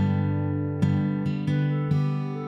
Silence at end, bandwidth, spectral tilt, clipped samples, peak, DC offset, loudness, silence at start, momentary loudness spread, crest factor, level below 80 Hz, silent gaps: 0 s; 6 kHz; -9.5 dB/octave; under 0.1%; -10 dBFS; under 0.1%; -26 LUFS; 0 s; 3 LU; 14 dB; -58 dBFS; none